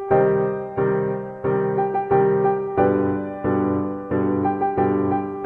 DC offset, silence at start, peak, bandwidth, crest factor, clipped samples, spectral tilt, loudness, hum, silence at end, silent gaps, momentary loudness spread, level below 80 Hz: under 0.1%; 0 s; -6 dBFS; 3.4 kHz; 16 dB; under 0.1%; -11.5 dB/octave; -21 LUFS; none; 0 s; none; 6 LU; -54 dBFS